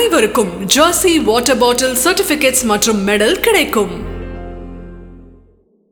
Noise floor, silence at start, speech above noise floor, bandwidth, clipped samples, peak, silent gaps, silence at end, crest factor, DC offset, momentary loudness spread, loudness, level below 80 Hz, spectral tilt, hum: -51 dBFS; 0 s; 38 dB; over 20 kHz; under 0.1%; 0 dBFS; none; 0.7 s; 14 dB; under 0.1%; 18 LU; -12 LUFS; -36 dBFS; -2.5 dB/octave; none